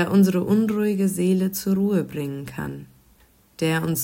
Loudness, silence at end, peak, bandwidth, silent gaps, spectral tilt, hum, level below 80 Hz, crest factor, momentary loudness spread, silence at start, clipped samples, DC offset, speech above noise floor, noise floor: -22 LUFS; 0 s; -8 dBFS; 16.5 kHz; none; -6.5 dB/octave; none; -56 dBFS; 14 dB; 13 LU; 0 s; under 0.1%; under 0.1%; 35 dB; -57 dBFS